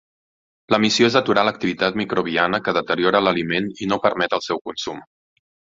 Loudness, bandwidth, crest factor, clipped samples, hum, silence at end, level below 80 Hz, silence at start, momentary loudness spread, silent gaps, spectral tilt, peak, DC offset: -20 LUFS; 7.8 kHz; 20 dB; under 0.1%; none; 0.75 s; -58 dBFS; 0.7 s; 10 LU; 4.61-4.65 s; -4.5 dB/octave; -2 dBFS; under 0.1%